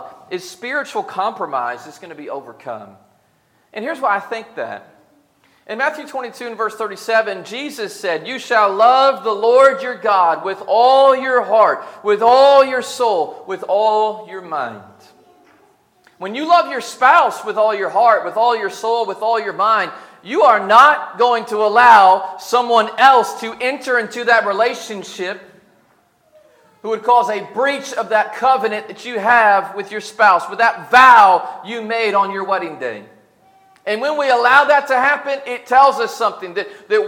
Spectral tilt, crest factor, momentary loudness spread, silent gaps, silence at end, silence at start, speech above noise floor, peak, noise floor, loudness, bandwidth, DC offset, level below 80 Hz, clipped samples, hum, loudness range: -3 dB/octave; 16 dB; 17 LU; none; 0 s; 0 s; 44 dB; 0 dBFS; -59 dBFS; -15 LUFS; 16.5 kHz; under 0.1%; -68 dBFS; under 0.1%; none; 12 LU